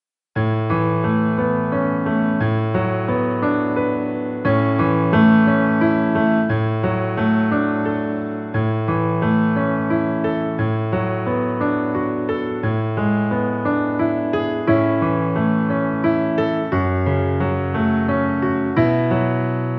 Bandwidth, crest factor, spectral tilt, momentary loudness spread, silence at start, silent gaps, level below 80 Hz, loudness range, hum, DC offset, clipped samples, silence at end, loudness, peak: 5.4 kHz; 14 dB; -11 dB/octave; 5 LU; 0.35 s; none; -48 dBFS; 4 LU; none; under 0.1%; under 0.1%; 0 s; -19 LUFS; -4 dBFS